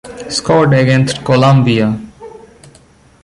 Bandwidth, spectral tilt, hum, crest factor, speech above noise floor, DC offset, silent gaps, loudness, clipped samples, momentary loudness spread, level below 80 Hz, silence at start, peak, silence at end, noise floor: 11.5 kHz; -6 dB/octave; none; 12 dB; 35 dB; under 0.1%; none; -11 LUFS; under 0.1%; 10 LU; -44 dBFS; 0.05 s; 0 dBFS; 0.85 s; -45 dBFS